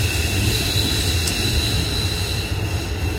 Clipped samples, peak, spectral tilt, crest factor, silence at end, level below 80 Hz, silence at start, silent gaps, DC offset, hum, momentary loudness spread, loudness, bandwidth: under 0.1%; -6 dBFS; -3.5 dB/octave; 14 dB; 0 s; -28 dBFS; 0 s; none; under 0.1%; none; 5 LU; -20 LUFS; 16 kHz